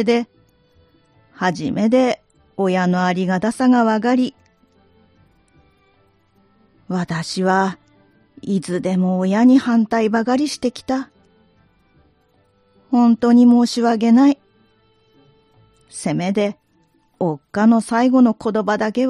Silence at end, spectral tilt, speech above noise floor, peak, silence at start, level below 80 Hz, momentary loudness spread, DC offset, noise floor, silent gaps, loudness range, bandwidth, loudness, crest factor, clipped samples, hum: 0 s; -6.5 dB/octave; 44 dB; -4 dBFS; 0 s; -60 dBFS; 12 LU; under 0.1%; -60 dBFS; none; 8 LU; 11 kHz; -17 LUFS; 16 dB; under 0.1%; none